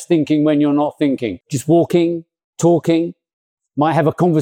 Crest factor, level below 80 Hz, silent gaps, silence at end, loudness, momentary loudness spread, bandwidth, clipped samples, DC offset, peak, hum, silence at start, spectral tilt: 12 dB; -62 dBFS; 2.44-2.53 s, 3.33-3.57 s; 0 s; -16 LUFS; 9 LU; 15 kHz; under 0.1%; under 0.1%; -4 dBFS; none; 0 s; -7 dB/octave